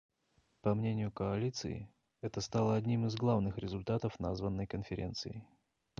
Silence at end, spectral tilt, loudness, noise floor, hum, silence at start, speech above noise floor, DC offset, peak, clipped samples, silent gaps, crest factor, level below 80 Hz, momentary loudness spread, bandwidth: 0.55 s; -7 dB/octave; -37 LUFS; -75 dBFS; none; 0.65 s; 40 dB; under 0.1%; -20 dBFS; under 0.1%; none; 18 dB; -56 dBFS; 11 LU; 7.4 kHz